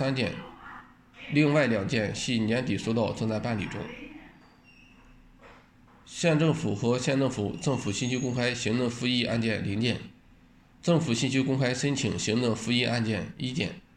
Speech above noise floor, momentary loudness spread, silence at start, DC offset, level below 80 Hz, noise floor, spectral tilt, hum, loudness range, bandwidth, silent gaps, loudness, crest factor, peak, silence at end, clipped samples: 30 dB; 12 LU; 0 s; under 0.1%; -58 dBFS; -57 dBFS; -5 dB/octave; none; 5 LU; 10.5 kHz; none; -28 LUFS; 18 dB; -12 dBFS; 0.15 s; under 0.1%